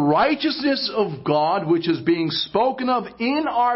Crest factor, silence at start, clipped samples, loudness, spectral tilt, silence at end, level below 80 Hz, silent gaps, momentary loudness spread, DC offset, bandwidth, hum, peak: 14 dB; 0 s; under 0.1%; -21 LUFS; -9.5 dB/octave; 0 s; -58 dBFS; none; 4 LU; under 0.1%; 5.8 kHz; none; -8 dBFS